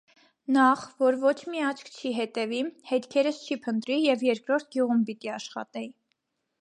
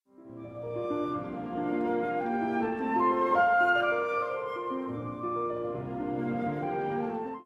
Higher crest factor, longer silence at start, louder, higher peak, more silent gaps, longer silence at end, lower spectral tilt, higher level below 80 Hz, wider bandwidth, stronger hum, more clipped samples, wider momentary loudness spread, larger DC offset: about the same, 18 dB vs 16 dB; first, 0.5 s vs 0.2 s; first, -27 LUFS vs -30 LUFS; first, -10 dBFS vs -14 dBFS; neither; first, 0.7 s vs 0 s; second, -4.5 dB/octave vs -7.5 dB/octave; second, -82 dBFS vs -64 dBFS; first, 11 kHz vs 7.6 kHz; neither; neither; about the same, 13 LU vs 11 LU; neither